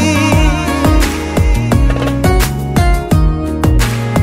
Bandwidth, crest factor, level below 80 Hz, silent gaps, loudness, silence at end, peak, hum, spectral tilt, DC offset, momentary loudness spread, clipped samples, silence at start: 16.5 kHz; 10 dB; -16 dBFS; none; -13 LUFS; 0 s; 0 dBFS; none; -6 dB/octave; under 0.1%; 3 LU; under 0.1%; 0 s